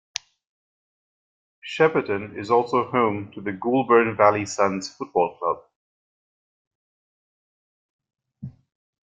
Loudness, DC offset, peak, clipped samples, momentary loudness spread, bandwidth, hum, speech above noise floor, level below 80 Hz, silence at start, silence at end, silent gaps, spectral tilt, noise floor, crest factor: -22 LUFS; under 0.1%; -2 dBFS; under 0.1%; 17 LU; 9.2 kHz; none; 20 dB; -68 dBFS; 1.65 s; 0.6 s; 5.76-7.99 s; -5 dB/octave; -41 dBFS; 24 dB